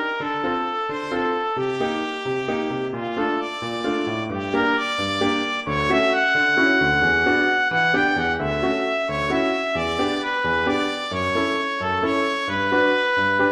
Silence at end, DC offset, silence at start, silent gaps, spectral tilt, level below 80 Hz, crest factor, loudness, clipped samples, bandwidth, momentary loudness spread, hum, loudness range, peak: 0 s; under 0.1%; 0 s; none; -5 dB/octave; -48 dBFS; 16 dB; -21 LUFS; under 0.1%; 12 kHz; 7 LU; none; 6 LU; -6 dBFS